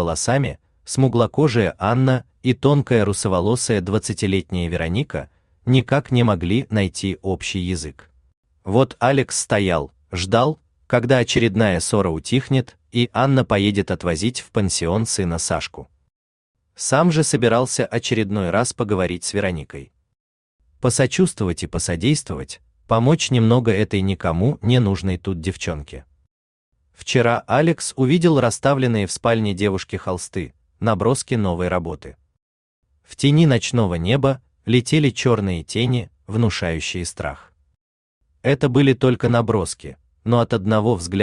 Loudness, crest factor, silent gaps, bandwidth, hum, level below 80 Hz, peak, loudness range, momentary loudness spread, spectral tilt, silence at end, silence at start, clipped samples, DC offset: -19 LUFS; 18 dB; 8.37-8.43 s, 16.16-16.54 s, 20.20-20.59 s, 26.31-26.72 s, 32.42-32.83 s, 37.81-38.21 s; 12.5 kHz; none; -46 dBFS; -2 dBFS; 4 LU; 10 LU; -5.5 dB/octave; 0 s; 0 s; under 0.1%; under 0.1%